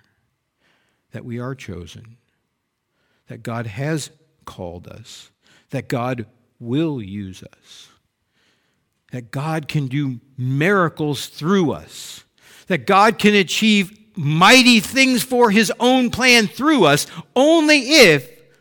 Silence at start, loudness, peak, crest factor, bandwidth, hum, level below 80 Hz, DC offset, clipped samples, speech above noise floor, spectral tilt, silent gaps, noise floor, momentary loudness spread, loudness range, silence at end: 1.15 s; -16 LUFS; 0 dBFS; 18 dB; 19 kHz; none; -56 dBFS; under 0.1%; under 0.1%; 56 dB; -4 dB/octave; none; -73 dBFS; 22 LU; 17 LU; 0.35 s